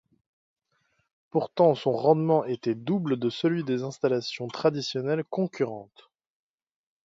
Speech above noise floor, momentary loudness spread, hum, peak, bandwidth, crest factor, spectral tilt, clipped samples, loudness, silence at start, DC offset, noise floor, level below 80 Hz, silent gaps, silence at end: 47 dB; 8 LU; none; -8 dBFS; 7.8 kHz; 20 dB; -7 dB/octave; under 0.1%; -27 LUFS; 1.35 s; under 0.1%; -73 dBFS; -74 dBFS; none; 1.2 s